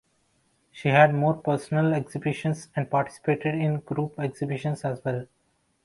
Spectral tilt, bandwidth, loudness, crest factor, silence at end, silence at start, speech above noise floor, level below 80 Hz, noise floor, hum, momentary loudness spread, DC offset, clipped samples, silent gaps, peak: -7.5 dB/octave; 11.5 kHz; -26 LUFS; 20 dB; 0.6 s; 0.75 s; 43 dB; -64 dBFS; -68 dBFS; none; 11 LU; under 0.1%; under 0.1%; none; -6 dBFS